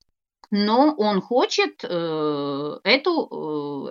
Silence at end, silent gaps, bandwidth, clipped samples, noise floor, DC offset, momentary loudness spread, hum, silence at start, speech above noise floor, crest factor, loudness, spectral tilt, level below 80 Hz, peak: 0 s; none; 7.6 kHz; under 0.1%; -57 dBFS; under 0.1%; 10 LU; none; 0.5 s; 35 dB; 20 dB; -22 LUFS; -5 dB/octave; -80 dBFS; -4 dBFS